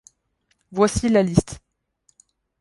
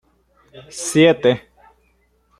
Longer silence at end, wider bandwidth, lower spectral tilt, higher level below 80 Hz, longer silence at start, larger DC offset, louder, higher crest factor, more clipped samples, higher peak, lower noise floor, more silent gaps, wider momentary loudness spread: about the same, 1.05 s vs 1 s; second, 11.5 kHz vs 13.5 kHz; first, -6 dB/octave vs -4.5 dB/octave; first, -42 dBFS vs -58 dBFS; first, 0.7 s vs 0.55 s; neither; second, -20 LUFS vs -16 LUFS; about the same, 22 dB vs 18 dB; neither; about the same, -2 dBFS vs -2 dBFS; first, -69 dBFS vs -61 dBFS; neither; first, 20 LU vs 15 LU